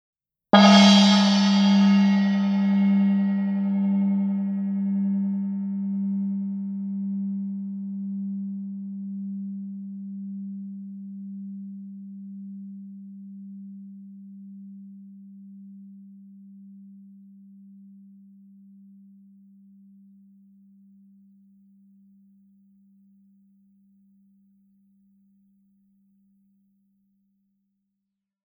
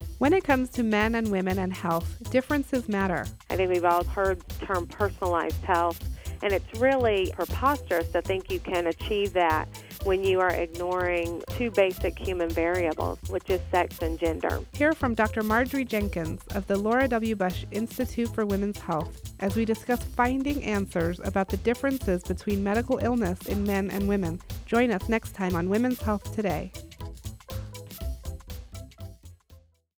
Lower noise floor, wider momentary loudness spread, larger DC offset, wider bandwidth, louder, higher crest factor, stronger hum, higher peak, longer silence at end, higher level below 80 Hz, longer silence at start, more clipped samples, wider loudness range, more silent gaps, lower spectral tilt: first, -83 dBFS vs -56 dBFS; first, 26 LU vs 12 LU; neither; second, 8 kHz vs over 20 kHz; first, -22 LUFS vs -27 LUFS; first, 24 dB vs 18 dB; neither; first, -2 dBFS vs -8 dBFS; first, 11.5 s vs 0.4 s; second, -80 dBFS vs -40 dBFS; first, 0.55 s vs 0 s; neither; first, 27 LU vs 2 LU; neither; about the same, -5.5 dB/octave vs -6 dB/octave